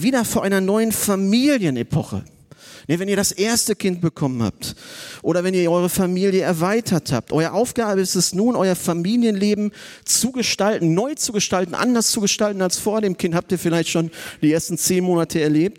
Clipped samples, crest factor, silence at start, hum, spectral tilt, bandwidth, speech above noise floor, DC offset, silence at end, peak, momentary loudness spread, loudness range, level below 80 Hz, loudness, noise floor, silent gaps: under 0.1%; 16 dB; 0 s; none; -4.5 dB/octave; 17 kHz; 25 dB; under 0.1%; 0.05 s; -2 dBFS; 6 LU; 2 LU; -54 dBFS; -19 LUFS; -44 dBFS; none